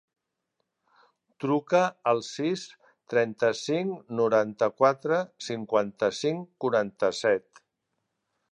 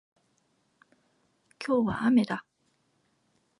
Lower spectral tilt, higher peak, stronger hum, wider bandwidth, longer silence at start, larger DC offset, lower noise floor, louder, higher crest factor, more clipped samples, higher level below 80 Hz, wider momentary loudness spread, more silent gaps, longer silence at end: second, -5 dB/octave vs -7 dB/octave; first, -8 dBFS vs -14 dBFS; neither; about the same, 11 kHz vs 11 kHz; second, 1.4 s vs 1.6 s; neither; first, -81 dBFS vs -72 dBFS; about the same, -27 LUFS vs -27 LUFS; about the same, 20 dB vs 18 dB; neither; second, -74 dBFS vs -64 dBFS; second, 8 LU vs 13 LU; neither; about the same, 1.15 s vs 1.2 s